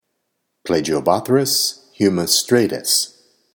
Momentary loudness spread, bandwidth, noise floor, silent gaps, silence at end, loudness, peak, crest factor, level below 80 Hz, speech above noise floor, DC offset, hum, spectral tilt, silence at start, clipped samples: 7 LU; 19.5 kHz; -73 dBFS; none; 0.45 s; -17 LUFS; 0 dBFS; 20 dB; -56 dBFS; 56 dB; under 0.1%; none; -3 dB/octave; 0.65 s; under 0.1%